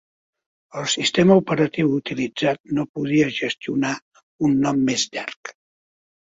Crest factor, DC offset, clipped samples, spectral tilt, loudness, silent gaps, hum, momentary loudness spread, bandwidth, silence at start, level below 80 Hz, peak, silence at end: 18 dB; under 0.1%; under 0.1%; -5 dB/octave; -21 LUFS; 2.60-2.64 s, 2.89-2.94 s, 4.02-4.11 s, 4.23-4.39 s, 5.36-5.43 s; none; 14 LU; 8 kHz; 0.75 s; -60 dBFS; -2 dBFS; 0.8 s